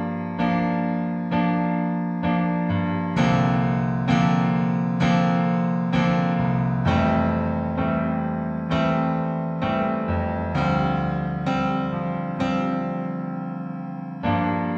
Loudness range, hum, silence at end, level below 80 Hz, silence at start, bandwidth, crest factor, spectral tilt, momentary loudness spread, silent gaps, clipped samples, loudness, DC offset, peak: 4 LU; none; 0 s; -44 dBFS; 0 s; 6.8 kHz; 14 dB; -8 dB/octave; 7 LU; none; under 0.1%; -23 LUFS; under 0.1%; -8 dBFS